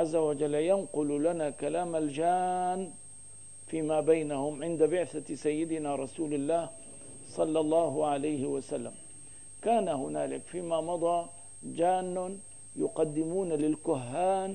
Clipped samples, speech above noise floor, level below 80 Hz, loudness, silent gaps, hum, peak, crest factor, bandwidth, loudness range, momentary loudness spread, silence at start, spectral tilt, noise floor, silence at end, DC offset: under 0.1%; 20 dB; -68 dBFS; -31 LUFS; none; none; -14 dBFS; 18 dB; 10 kHz; 2 LU; 16 LU; 0 s; -5.5 dB/octave; -50 dBFS; 0 s; 0.3%